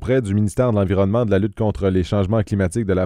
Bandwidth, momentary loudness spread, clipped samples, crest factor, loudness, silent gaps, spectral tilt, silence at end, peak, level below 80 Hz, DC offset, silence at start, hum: 11.5 kHz; 3 LU; under 0.1%; 12 dB; -19 LUFS; none; -8 dB/octave; 0 s; -6 dBFS; -38 dBFS; under 0.1%; 0 s; none